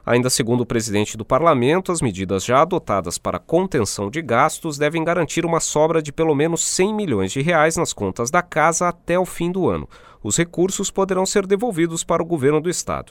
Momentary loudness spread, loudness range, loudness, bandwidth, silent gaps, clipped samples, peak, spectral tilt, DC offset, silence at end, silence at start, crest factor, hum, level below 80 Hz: 6 LU; 2 LU; -19 LUFS; 18.5 kHz; none; under 0.1%; -2 dBFS; -4.5 dB/octave; under 0.1%; 0.1 s; 0.05 s; 18 dB; none; -46 dBFS